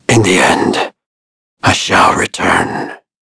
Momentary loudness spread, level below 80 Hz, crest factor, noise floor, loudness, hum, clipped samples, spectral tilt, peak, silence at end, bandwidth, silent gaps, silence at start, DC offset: 12 LU; -42 dBFS; 14 dB; under -90 dBFS; -11 LUFS; none; under 0.1%; -4 dB/octave; 0 dBFS; 0.25 s; 11 kHz; 1.06-1.57 s; 0.1 s; under 0.1%